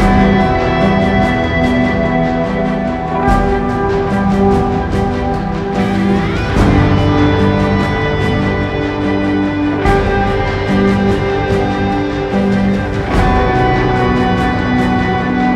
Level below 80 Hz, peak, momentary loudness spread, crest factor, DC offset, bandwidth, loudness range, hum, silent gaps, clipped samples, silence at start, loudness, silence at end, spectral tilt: -24 dBFS; 0 dBFS; 4 LU; 12 dB; under 0.1%; 10.5 kHz; 1 LU; none; none; under 0.1%; 0 s; -14 LUFS; 0 s; -7.5 dB/octave